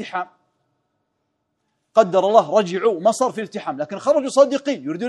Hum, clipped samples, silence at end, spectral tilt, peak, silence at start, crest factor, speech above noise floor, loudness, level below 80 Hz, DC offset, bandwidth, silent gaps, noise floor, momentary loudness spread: none; under 0.1%; 0 s; -5 dB/octave; 0 dBFS; 0 s; 20 dB; 55 dB; -19 LUFS; -76 dBFS; under 0.1%; 12 kHz; none; -73 dBFS; 12 LU